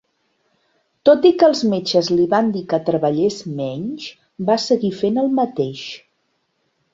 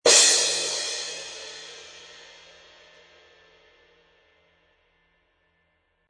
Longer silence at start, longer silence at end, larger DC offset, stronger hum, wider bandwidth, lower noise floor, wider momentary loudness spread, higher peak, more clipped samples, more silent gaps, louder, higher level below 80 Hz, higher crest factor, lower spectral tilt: first, 1.05 s vs 0.05 s; second, 0.95 s vs 4.1 s; neither; neither; second, 7.8 kHz vs 10.5 kHz; about the same, -68 dBFS vs -70 dBFS; second, 15 LU vs 30 LU; about the same, -2 dBFS vs -4 dBFS; neither; neither; about the same, -18 LUFS vs -20 LUFS; first, -62 dBFS vs -70 dBFS; second, 18 dB vs 24 dB; first, -6 dB/octave vs 2 dB/octave